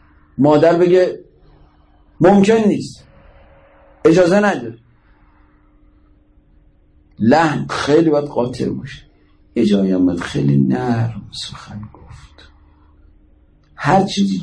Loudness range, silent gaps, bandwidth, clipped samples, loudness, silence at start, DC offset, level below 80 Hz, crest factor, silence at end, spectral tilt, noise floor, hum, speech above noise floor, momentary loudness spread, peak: 6 LU; none; 10.5 kHz; under 0.1%; -15 LUFS; 0.4 s; under 0.1%; -48 dBFS; 14 dB; 0 s; -7 dB/octave; -51 dBFS; none; 37 dB; 19 LU; -2 dBFS